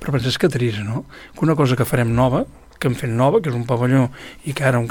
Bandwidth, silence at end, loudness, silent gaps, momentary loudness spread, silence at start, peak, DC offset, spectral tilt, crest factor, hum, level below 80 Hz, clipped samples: 18.5 kHz; 0 s; -19 LUFS; none; 11 LU; 0 s; -4 dBFS; under 0.1%; -6.5 dB/octave; 16 dB; none; -42 dBFS; under 0.1%